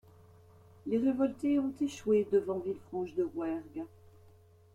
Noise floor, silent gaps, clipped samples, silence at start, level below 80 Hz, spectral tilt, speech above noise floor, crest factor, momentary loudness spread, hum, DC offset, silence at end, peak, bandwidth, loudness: -60 dBFS; none; under 0.1%; 0.85 s; -68 dBFS; -7 dB/octave; 28 dB; 16 dB; 14 LU; none; under 0.1%; 0.85 s; -18 dBFS; 12 kHz; -33 LUFS